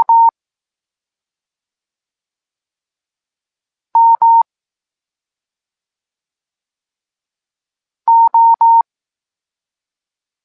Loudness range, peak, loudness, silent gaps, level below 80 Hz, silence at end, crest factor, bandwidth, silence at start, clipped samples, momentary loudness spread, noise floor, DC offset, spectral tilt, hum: 6 LU; -4 dBFS; -11 LUFS; none; -86 dBFS; 1.65 s; 12 dB; 1.7 kHz; 0 s; under 0.1%; 11 LU; -89 dBFS; under 0.1%; -6 dB/octave; none